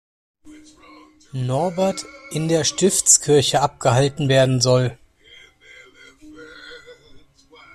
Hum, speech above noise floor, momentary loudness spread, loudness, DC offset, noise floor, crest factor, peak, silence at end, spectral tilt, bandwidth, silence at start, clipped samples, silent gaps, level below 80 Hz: none; 31 dB; 20 LU; -18 LUFS; under 0.1%; -49 dBFS; 22 dB; 0 dBFS; 0.8 s; -4 dB/octave; 13.5 kHz; 0.45 s; under 0.1%; none; -52 dBFS